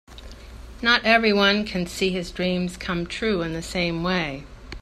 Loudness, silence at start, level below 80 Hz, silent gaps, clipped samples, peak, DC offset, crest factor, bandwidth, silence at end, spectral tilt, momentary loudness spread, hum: -22 LUFS; 0.1 s; -42 dBFS; none; under 0.1%; -2 dBFS; under 0.1%; 22 dB; 14 kHz; 0.05 s; -4.5 dB/octave; 23 LU; none